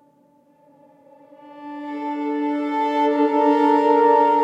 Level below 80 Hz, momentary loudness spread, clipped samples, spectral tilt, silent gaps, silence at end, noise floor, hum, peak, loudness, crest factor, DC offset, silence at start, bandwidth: -74 dBFS; 17 LU; under 0.1%; -5 dB/octave; none; 0 s; -57 dBFS; none; -4 dBFS; -19 LUFS; 16 dB; under 0.1%; 1.45 s; 7.8 kHz